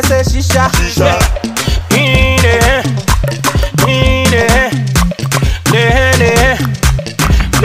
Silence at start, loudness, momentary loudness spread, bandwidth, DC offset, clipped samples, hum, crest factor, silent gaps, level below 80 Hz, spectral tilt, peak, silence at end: 0 s; -11 LUFS; 5 LU; 16.5 kHz; 0.6%; under 0.1%; none; 10 dB; none; -16 dBFS; -4.5 dB/octave; 0 dBFS; 0 s